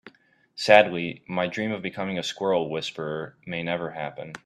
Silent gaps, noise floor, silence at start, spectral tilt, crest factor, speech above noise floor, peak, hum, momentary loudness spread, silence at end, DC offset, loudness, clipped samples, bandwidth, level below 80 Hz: none; -57 dBFS; 0.05 s; -5 dB/octave; 24 dB; 32 dB; -2 dBFS; none; 16 LU; 0.1 s; under 0.1%; -25 LUFS; under 0.1%; 12.5 kHz; -68 dBFS